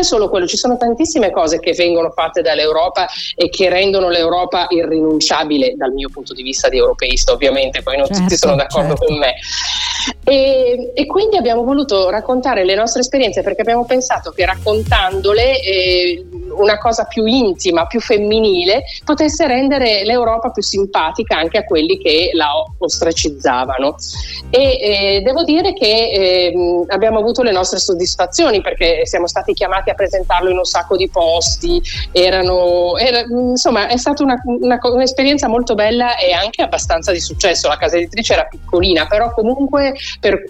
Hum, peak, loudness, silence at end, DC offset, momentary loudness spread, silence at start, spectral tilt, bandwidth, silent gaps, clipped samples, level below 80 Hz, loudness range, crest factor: none; 0 dBFS; -14 LUFS; 0 s; under 0.1%; 5 LU; 0 s; -3.5 dB/octave; 12 kHz; none; under 0.1%; -30 dBFS; 1 LU; 14 dB